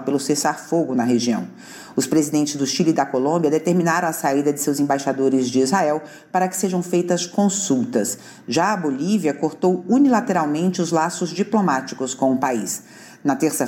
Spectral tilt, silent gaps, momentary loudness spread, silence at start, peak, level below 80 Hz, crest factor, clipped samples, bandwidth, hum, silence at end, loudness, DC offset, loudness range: -5 dB/octave; none; 6 LU; 0 s; -6 dBFS; -68 dBFS; 14 dB; under 0.1%; 17 kHz; none; 0 s; -20 LUFS; under 0.1%; 2 LU